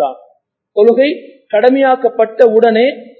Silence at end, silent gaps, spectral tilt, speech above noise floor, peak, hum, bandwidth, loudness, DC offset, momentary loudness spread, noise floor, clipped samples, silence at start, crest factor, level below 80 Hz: 0.15 s; none; -7 dB/octave; 44 dB; 0 dBFS; none; 4.5 kHz; -11 LUFS; under 0.1%; 10 LU; -54 dBFS; 0.4%; 0 s; 12 dB; -68 dBFS